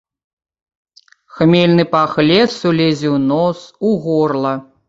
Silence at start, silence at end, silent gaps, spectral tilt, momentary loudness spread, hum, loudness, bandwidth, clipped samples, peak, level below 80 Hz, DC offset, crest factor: 1.35 s; 0.25 s; none; -7 dB/octave; 7 LU; none; -14 LUFS; 7.8 kHz; under 0.1%; -2 dBFS; -54 dBFS; under 0.1%; 14 dB